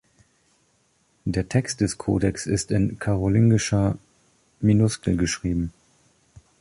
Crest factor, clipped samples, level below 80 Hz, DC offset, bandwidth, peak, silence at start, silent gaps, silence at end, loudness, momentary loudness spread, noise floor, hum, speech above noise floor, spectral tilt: 16 dB; under 0.1%; -42 dBFS; under 0.1%; 11.5 kHz; -6 dBFS; 1.25 s; none; 0.9 s; -23 LUFS; 9 LU; -65 dBFS; none; 44 dB; -6 dB/octave